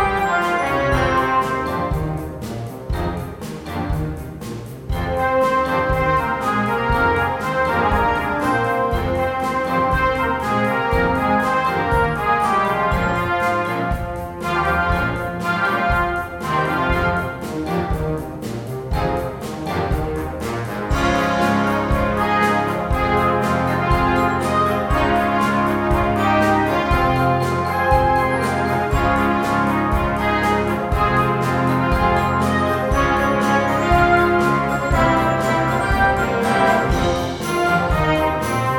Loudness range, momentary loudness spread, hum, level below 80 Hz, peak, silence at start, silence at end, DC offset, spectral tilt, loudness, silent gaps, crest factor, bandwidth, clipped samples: 6 LU; 8 LU; none; -30 dBFS; -2 dBFS; 0 s; 0 s; under 0.1%; -6 dB/octave; -19 LUFS; none; 16 dB; 19 kHz; under 0.1%